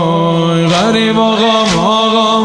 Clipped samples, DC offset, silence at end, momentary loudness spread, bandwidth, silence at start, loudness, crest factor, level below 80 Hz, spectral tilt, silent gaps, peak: under 0.1%; 0.3%; 0 s; 2 LU; 10.5 kHz; 0 s; -10 LUFS; 10 dB; -42 dBFS; -5 dB/octave; none; 0 dBFS